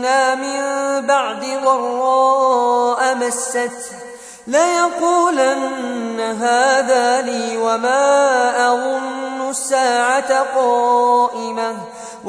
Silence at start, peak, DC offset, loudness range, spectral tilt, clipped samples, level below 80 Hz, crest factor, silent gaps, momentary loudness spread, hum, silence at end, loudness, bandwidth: 0 s; -2 dBFS; under 0.1%; 2 LU; -1.5 dB/octave; under 0.1%; -68 dBFS; 14 dB; none; 9 LU; none; 0 s; -16 LUFS; 11 kHz